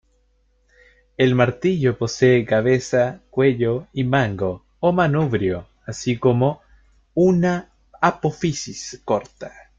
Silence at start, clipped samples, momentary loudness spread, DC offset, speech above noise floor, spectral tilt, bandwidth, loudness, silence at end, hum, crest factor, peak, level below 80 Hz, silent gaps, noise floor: 1.2 s; under 0.1%; 11 LU; under 0.1%; 43 dB; -6.5 dB/octave; 7.8 kHz; -20 LUFS; 0.3 s; none; 18 dB; -2 dBFS; -52 dBFS; none; -62 dBFS